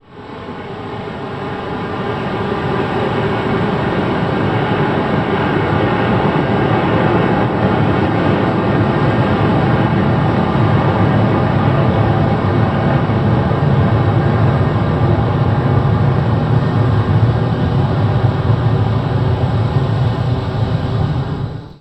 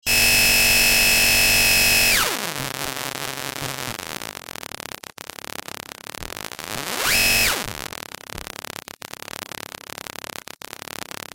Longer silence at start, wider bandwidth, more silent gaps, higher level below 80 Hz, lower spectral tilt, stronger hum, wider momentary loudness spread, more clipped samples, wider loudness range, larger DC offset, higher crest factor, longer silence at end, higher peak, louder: about the same, 0.1 s vs 0.05 s; second, 8.2 kHz vs 17 kHz; neither; first, -32 dBFS vs -40 dBFS; first, -9 dB/octave vs -0.5 dB/octave; neither; second, 7 LU vs 21 LU; neither; second, 3 LU vs 16 LU; neither; second, 14 dB vs 20 dB; second, 0.05 s vs 1.9 s; first, 0 dBFS vs -4 dBFS; about the same, -15 LUFS vs -17 LUFS